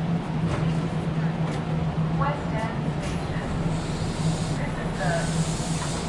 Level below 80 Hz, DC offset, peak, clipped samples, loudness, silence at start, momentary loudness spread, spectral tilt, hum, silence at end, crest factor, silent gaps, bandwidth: -38 dBFS; under 0.1%; -12 dBFS; under 0.1%; -27 LUFS; 0 s; 3 LU; -6 dB/octave; none; 0 s; 14 dB; none; 11.5 kHz